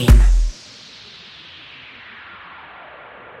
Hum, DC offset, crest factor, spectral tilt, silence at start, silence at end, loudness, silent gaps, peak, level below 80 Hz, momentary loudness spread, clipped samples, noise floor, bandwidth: none; under 0.1%; 18 dB; -6 dB/octave; 0 s; 2.9 s; -17 LUFS; none; 0 dBFS; -20 dBFS; 22 LU; under 0.1%; -41 dBFS; 13.5 kHz